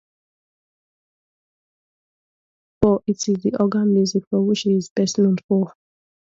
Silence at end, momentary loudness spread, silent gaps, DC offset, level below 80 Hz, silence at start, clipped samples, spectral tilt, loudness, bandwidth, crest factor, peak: 0.7 s; 4 LU; 4.27-4.31 s, 4.90-4.96 s, 5.44-5.49 s; under 0.1%; -52 dBFS; 2.8 s; under 0.1%; -6 dB/octave; -20 LUFS; 7.8 kHz; 20 dB; -2 dBFS